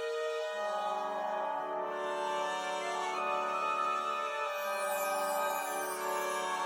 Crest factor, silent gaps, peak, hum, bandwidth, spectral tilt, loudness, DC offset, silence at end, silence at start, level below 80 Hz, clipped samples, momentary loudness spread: 12 dB; none; -22 dBFS; none; 17 kHz; -1.5 dB/octave; -34 LUFS; under 0.1%; 0 s; 0 s; -88 dBFS; under 0.1%; 3 LU